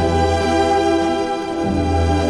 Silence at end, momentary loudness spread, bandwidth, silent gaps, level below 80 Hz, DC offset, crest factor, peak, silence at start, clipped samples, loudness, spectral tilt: 0 s; 5 LU; 11.5 kHz; none; -30 dBFS; under 0.1%; 12 dB; -4 dBFS; 0 s; under 0.1%; -18 LUFS; -6 dB/octave